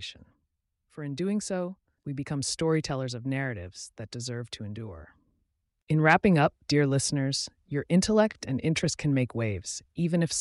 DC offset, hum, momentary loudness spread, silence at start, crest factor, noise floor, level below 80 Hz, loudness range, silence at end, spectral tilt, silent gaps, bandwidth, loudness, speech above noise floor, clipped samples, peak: under 0.1%; none; 16 LU; 0 s; 20 dB; -79 dBFS; -56 dBFS; 7 LU; 0 s; -5 dB/octave; 5.82-5.87 s; 11.5 kHz; -28 LUFS; 51 dB; under 0.1%; -8 dBFS